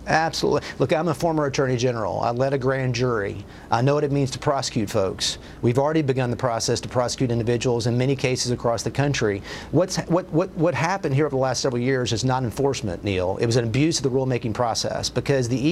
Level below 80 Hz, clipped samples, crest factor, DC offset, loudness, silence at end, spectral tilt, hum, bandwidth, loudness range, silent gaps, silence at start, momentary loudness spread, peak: -46 dBFS; under 0.1%; 18 dB; under 0.1%; -23 LUFS; 0 s; -5 dB/octave; none; 14 kHz; 1 LU; none; 0 s; 4 LU; -4 dBFS